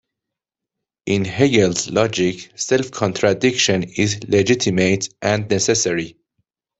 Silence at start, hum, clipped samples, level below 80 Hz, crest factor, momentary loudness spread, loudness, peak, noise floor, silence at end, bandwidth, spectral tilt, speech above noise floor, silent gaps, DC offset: 1.05 s; none; under 0.1%; -54 dBFS; 18 dB; 7 LU; -18 LUFS; -2 dBFS; -84 dBFS; 0.7 s; 8.4 kHz; -4 dB/octave; 66 dB; none; under 0.1%